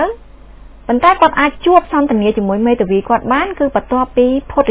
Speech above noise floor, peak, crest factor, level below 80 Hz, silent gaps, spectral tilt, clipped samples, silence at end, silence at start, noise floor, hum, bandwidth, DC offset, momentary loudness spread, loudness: 24 dB; 0 dBFS; 14 dB; -36 dBFS; none; -10 dB/octave; 0.1%; 0 s; 0 s; -36 dBFS; none; 4 kHz; under 0.1%; 6 LU; -13 LUFS